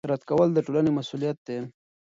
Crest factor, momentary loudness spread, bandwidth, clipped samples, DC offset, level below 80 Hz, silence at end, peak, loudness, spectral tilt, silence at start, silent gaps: 16 dB; 13 LU; 7.6 kHz; under 0.1%; under 0.1%; -64 dBFS; 0.5 s; -10 dBFS; -26 LUFS; -8 dB/octave; 0.05 s; 1.38-1.45 s